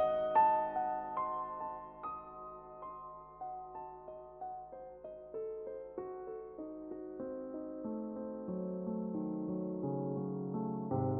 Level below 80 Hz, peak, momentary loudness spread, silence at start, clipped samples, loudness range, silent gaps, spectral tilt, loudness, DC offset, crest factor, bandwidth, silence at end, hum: -70 dBFS; -18 dBFS; 14 LU; 0 s; under 0.1%; 9 LU; none; -8 dB/octave; -39 LUFS; under 0.1%; 20 dB; 4 kHz; 0 s; none